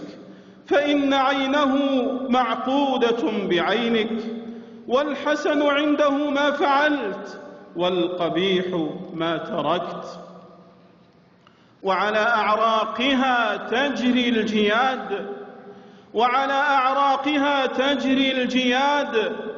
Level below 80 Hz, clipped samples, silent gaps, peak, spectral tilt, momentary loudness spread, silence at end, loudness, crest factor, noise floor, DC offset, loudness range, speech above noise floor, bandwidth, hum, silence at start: -64 dBFS; under 0.1%; none; -8 dBFS; -5 dB/octave; 11 LU; 0 s; -21 LUFS; 14 dB; -54 dBFS; under 0.1%; 5 LU; 33 dB; 7.4 kHz; none; 0 s